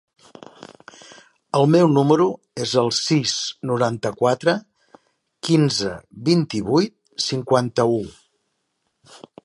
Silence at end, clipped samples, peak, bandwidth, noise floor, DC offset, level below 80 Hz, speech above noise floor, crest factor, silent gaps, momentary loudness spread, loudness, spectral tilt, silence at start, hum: 0.3 s; under 0.1%; -2 dBFS; 11.5 kHz; -73 dBFS; under 0.1%; -58 dBFS; 54 dB; 20 dB; none; 11 LU; -20 LUFS; -5.5 dB/octave; 1.55 s; none